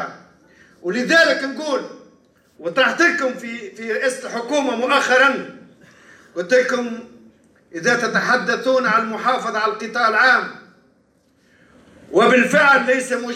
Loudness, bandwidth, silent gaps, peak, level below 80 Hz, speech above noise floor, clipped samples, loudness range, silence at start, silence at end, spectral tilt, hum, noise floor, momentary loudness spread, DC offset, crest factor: -17 LUFS; 14 kHz; none; -4 dBFS; -70 dBFS; 41 dB; under 0.1%; 3 LU; 0 s; 0 s; -3.5 dB/octave; none; -59 dBFS; 17 LU; under 0.1%; 16 dB